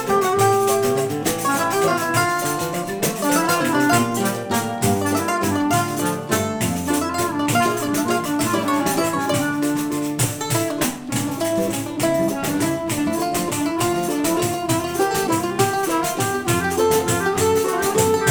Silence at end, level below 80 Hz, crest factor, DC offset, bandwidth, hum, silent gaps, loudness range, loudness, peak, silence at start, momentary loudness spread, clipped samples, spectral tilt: 0 s; -50 dBFS; 16 dB; under 0.1%; over 20 kHz; none; none; 2 LU; -20 LUFS; -4 dBFS; 0 s; 4 LU; under 0.1%; -4 dB/octave